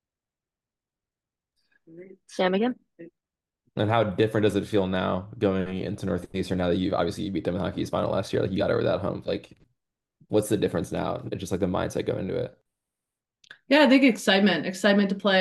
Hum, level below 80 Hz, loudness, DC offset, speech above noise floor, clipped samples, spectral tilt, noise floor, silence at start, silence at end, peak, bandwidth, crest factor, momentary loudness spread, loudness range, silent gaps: none; -60 dBFS; -25 LUFS; under 0.1%; over 65 dB; under 0.1%; -6 dB/octave; under -90 dBFS; 1.9 s; 0 s; -6 dBFS; 12.5 kHz; 20 dB; 11 LU; 7 LU; none